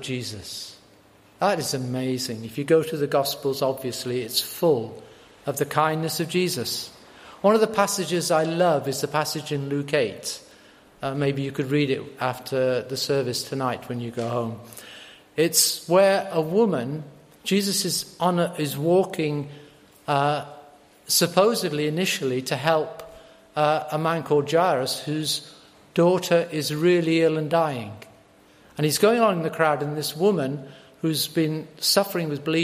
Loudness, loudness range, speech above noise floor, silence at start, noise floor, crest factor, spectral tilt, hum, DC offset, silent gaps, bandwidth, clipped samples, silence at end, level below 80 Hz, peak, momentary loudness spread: -23 LUFS; 4 LU; 31 dB; 0 s; -54 dBFS; 22 dB; -4 dB/octave; none; under 0.1%; none; 15.5 kHz; under 0.1%; 0 s; -66 dBFS; -2 dBFS; 13 LU